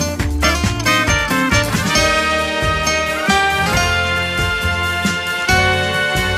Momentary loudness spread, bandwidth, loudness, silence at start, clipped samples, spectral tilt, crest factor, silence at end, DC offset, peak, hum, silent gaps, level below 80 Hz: 4 LU; 16 kHz; -15 LUFS; 0 s; under 0.1%; -3.5 dB/octave; 16 dB; 0 s; under 0.1%; -2 dBFS; none; none; -28 dBFS